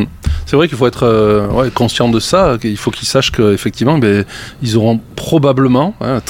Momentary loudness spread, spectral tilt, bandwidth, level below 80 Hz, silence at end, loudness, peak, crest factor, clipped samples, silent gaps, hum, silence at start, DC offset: 6 LU; -6 dB/octave; 16.5 kHz; -28 dBFS; 0 s; -13 LUFS; 0 dBFS; 12 dB; under 0.1%; none; none; 0 s; under 0.1%